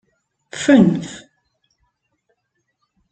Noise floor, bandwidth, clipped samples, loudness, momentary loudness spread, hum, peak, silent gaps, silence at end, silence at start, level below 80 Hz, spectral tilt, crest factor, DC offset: -72 dBFS; 9 kHz; under 0.1%; -15 LUFS; 22 LU; none; -2 dBFS; none; 1.95 s; 0.55 s; -58 dBFS; -6 dB/octave; 20 dB; under 0.1%